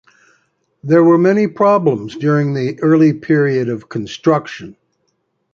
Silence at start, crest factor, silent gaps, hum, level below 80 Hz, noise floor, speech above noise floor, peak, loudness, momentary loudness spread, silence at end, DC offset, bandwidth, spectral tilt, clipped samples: 0.85 s; 14 dB; none; none; -58 dBFS; -67 dBFS; 53 dB; -2 dBFS; -14 LUFS; 13 LU; 0.8 s; under 0.1%; 7.2 kHz; -8 dB/octave; under 0.1%